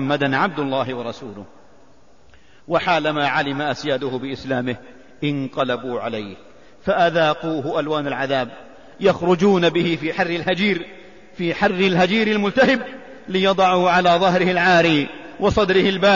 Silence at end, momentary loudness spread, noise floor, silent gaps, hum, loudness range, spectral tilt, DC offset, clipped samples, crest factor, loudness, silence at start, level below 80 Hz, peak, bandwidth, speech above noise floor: 0 s; 13 LU; -53 dBFS; none; none; 6 LU; -6 dB/octave; 0.5%; under 0.1%; 16 dB; -19 LUFS; 0 s; -50 dBFS; -4 dBFS; 7.4 kHz; 34 dB